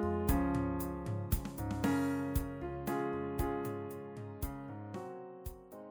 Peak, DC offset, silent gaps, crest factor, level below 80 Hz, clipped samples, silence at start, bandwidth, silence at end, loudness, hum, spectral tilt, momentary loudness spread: -18 dBFS; under 0.1%; none; 20 dB; -46 dBFS; under 0.1%; 0 s; over 20 kHz; 0 s; -38 LUFS; none; -7 dB/octave; 14 LU